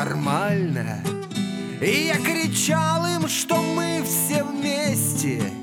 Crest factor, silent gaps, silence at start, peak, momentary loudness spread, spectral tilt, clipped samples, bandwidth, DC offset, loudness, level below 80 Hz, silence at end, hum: 16 dB; none; 0 s; -8 dBFS; 7 LU; -4 dB/octave; under 0.1%; 18.5 kHz; under 0.1%; -22 LUFS; -62 dBFS; 0 s; none